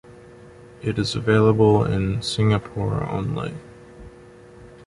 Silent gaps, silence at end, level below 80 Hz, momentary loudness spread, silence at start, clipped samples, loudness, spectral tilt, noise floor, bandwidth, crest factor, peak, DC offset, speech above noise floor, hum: none; 0.05 s; -44 dBFS; 13 LU; 0.1 s; under 0.1%; -21 LUFS; -6.5 dB/octave; -45 dBFS; 11.5 kHz; 18 dB; -4 dBFS; under 0.1%; 25 dB; none